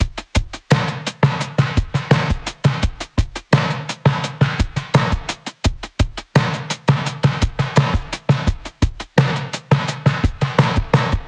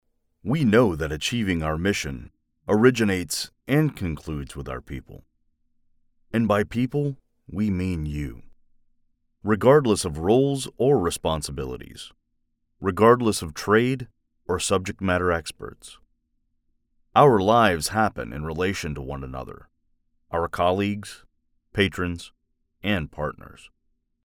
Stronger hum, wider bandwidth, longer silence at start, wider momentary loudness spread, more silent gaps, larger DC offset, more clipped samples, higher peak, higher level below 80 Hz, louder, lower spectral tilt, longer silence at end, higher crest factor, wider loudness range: neither; second, 9.8 kHz vs 18 kHz; second, 0 s vs 0.45 s; second, 6 LU vs 19 LU; neither; neither; neither; about the same, -2 dBFS vs -4 dBFS; first, -28 dBFS vs -44 dBFS; first, -19 LUFS vs -23 LUFS; about the same, -6 dB/octave vs -5.5 dB/octave; second, 0 s vs 0.7 s; second, 16 dB vs 22 dB; second, 1 LU vs 6 LU